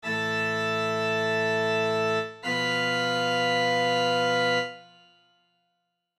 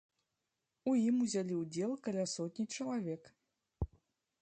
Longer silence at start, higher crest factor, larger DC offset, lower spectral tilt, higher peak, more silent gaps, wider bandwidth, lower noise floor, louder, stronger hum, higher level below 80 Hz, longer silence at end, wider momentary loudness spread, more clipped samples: second, 0.05 s vs 0.85 s; about the same, 14 dB vs 14 dB; neither; second, -4 dB/octave vs -5.5 dB/octave; first, -14 dBFS vs -24 dBFS; neither; first, 14 kHz vs 9 kHz; second, -78 dBFS vs -88 dBFS; first, -25 LUFS vs -37 LUFS; neither; second, -78 dBFS vs -56 dBFS; first, 1.35 s vs 0.55 s; second, 4 LU vs 13 LU; neither